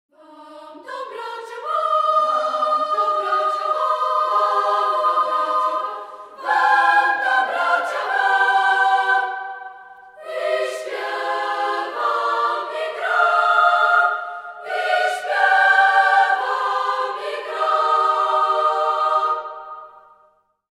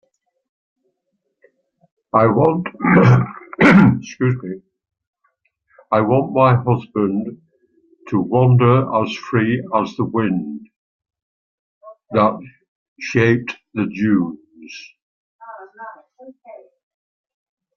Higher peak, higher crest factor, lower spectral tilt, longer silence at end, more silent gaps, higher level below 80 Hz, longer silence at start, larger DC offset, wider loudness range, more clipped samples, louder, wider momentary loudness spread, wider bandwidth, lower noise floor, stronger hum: second, -4 dBFS vs 0 dBFS; about the same, 16 dB vs 18 dB; second, 0 dB/octave vs -8 dB/octave; second, 0.85 s vs 1.2 s; second, none vs 5.07-5.13 s, 10.76-11.00 s, 11.22-11.81 s, 12.68-12.96 s, 15.02-15.39 s; second, -80 dBFS vs -54 dBFS; second, 0.3 s vs 2.15 s; neither; second, 5 LU vs 8 LU; neither; about the same, -18 LUFS vs -17 LUFS; second, 16 LU vs 23 LU; first, 13 kHz vs 7 kHz; second, -59 dBFS vs -73 dBFS; neither